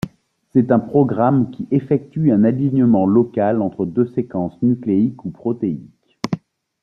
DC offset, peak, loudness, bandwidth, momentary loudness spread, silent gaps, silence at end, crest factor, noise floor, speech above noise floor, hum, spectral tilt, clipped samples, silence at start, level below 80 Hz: under 0.1%; -2 dBFS; -18 LUFS; 7 kHz; 11 LU; none; 0.45 s; 16 dB; -41 dBFS; 24 dB; none; -9.5 dB/octave; under 0.1%; 0.05 s; -56 dBFS